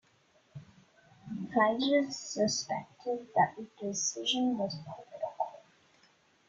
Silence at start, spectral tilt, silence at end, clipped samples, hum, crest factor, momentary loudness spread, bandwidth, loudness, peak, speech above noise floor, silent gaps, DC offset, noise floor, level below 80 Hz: 0.55 s; -3 dB/octave; 0.9 s; under 0.1%; none; 20 dB; 16 LU; 9.2 kHz; -32 LUFS; -14 dBFS; 36 dB; none; under 0.1%; -68 dBFS; -74 dBFS